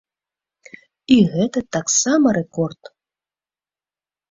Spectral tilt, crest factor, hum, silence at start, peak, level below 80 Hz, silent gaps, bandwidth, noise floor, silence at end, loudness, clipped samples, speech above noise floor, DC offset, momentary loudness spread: -4.5 dB/octave; 20 dB; none; 1.1 s; -2 dBFS; -56 dBFS; none; 7.8 kHz; under -90 dBFS; 1.6 s; -18 LUFS; under 0.1%; over 73 dB; under 0.1%; 11 LU